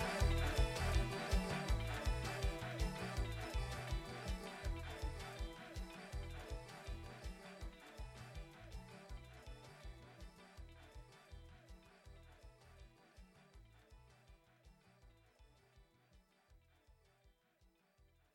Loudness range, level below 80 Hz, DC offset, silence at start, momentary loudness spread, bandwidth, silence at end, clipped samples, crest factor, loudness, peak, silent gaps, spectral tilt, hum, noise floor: 24 LU; -48 dBFS; under 0.1%; 0 s; 24 LU; 15.5 kHz; 1.05 s; under 0.1%; 22 dB; -45 LUFS; -24 dBFS; none; -5 dB/octave; none; -75 dBFS